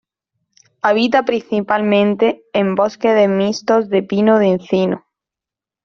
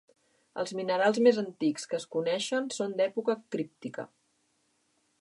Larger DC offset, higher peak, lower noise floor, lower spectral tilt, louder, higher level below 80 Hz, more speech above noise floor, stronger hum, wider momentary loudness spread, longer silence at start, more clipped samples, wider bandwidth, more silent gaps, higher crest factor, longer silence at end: neither; first, -2 dBFS vs -10 dBFS; first, -87 dBFS vs -73 dBFS; first, -6.5 dB/octave vs -4.5 dB/octave; first, -16 LUFS vs -30 LUFS; first, -60 dBFS vs -84 dBFS; first, 73 dB vs 44 dB; neither; second, 5 LU vs 16 LU; first, 0.85 s vs 0.55 s; neither; second, 7 kHz vs 11.5 kHz; neither; second, 14 dB vs 20 dB; second, 0.85 s vs 1.15 s